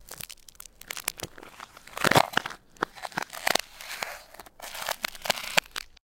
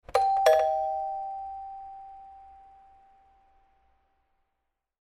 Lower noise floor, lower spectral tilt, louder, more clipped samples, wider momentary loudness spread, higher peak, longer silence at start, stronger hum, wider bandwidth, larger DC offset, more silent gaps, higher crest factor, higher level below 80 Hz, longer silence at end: second, -49 dBFS vs -81 dBFS; about the same, -2 dB/octave vs -1.5 dB/octave; second, -29 LUFS vs -26 LUFS; neither; second, 22 LU vs 25 LU; first, 0 dBFS vs -6 dBFS; about the same, 0 s vs 0.1 s; neither; first, 17 kHz vs 13.5 kHz; neither; neither; first, 32 dB vs 24 dB; about the same, -58 dBFS vs -62 dBFS; second, 0.25 s vs 2.5 s